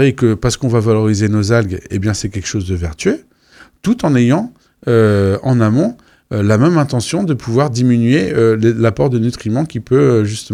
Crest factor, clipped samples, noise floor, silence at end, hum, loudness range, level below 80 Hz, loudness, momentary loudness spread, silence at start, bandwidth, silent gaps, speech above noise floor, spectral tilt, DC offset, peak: 12 dB; under 0.1%; -45 dBFS; 0 s; none; 3 LU; -40 dBFS; -14 LUFS; 8 LU; 0 s; 12 kHz; none; 32 dB; -6.5 dB/octave; under 0.1%; 0 dBFS